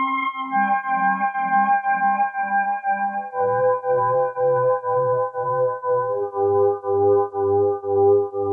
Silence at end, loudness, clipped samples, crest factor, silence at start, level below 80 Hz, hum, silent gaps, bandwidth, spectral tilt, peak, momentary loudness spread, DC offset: 0 s; -21 LUFS; under 0.1%; 12 dB; 0 s; -72 dBFS; none; none; 3.4 kHz; -9.5 dB/octave; -8 dBFS; 4 LU; under 0.1%